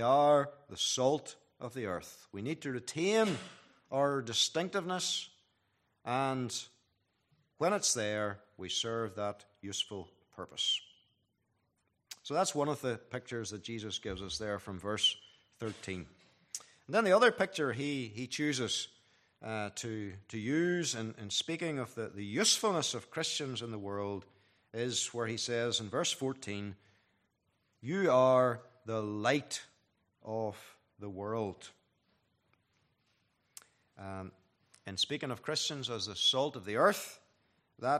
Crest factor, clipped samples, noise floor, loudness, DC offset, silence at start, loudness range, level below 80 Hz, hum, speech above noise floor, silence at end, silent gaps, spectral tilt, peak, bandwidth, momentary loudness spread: 22 dB; under 0.1%; -79 dBFS; -34 LUFS; under 0.1%; 0 s; 7 LU; -72 dBFS; none; 45 dB; 0 s; none; -3 dB/octave; -14 dBFS; 14.5 kHz; 17 LU